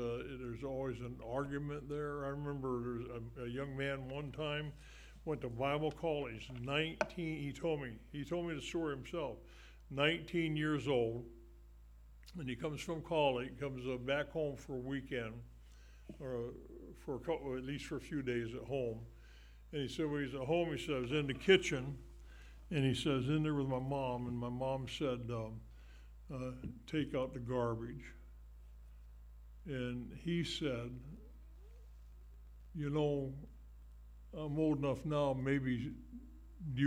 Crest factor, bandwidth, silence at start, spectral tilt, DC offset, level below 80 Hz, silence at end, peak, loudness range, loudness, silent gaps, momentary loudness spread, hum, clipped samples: 24 dB; 15.5 kHz; 0 s; -6 dB/octave; under 0.1%; -56 dBFS; 0 s; -16 dBFS; 7 LU; -39 LUFS; none; 23 LU; none; under 0.1%